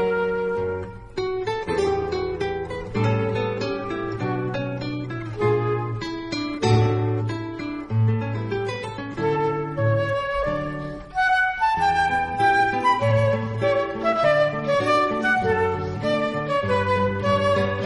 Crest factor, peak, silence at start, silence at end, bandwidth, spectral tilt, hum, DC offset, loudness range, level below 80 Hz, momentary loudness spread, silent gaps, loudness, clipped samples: 16 dB; -8 dBFS; 0 s; 0 s; 11.5 kHz; -6.5 dB/octave; none; under 0.1%; 5 LU; -46 dBFS; 9 LU; none; -23 LUFS; under 0.1%